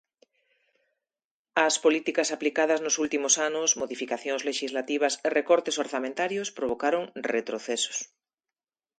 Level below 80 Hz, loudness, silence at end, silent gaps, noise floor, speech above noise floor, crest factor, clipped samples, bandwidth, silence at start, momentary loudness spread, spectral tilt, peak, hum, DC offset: -72 dBFS; -27 LUFS; 0.95 s; none; under -90 dBFS; over 63 dB; 22 dB; under 0.1%; 10 kHz; 1.55 s; 7 LU; -1 dB/octave; -8 dBFS; none; under 0.1%